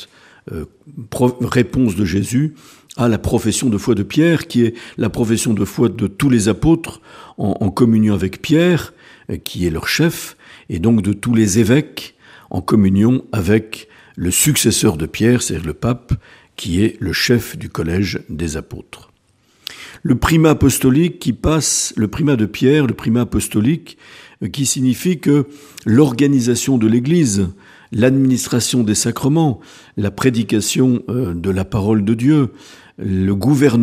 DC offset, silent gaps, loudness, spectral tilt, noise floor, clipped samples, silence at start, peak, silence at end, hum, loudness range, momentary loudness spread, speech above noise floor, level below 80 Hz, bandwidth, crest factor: under 0.1%; none; -16 LUFS; -5.5 dB/octave; -57 dBFS; under 0.1%; 0 s; 0 dBFS; 0 s; none; 3 LU; 15 LU; 41 dB; -38 dBFS; 15.5 kHz; 16 dB